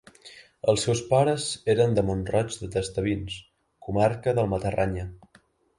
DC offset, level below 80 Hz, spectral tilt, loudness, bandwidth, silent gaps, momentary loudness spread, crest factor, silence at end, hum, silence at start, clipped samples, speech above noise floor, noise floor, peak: under 0.1%; -46 dBFS; -5.5 dB/octave; -26 LUFS; 11.5 kHz; none; 11 LU; 18 dB; 0.6 s; none; 0.25 s; under 0.1%; 36 dB; -61 dBFS; -8 dBFS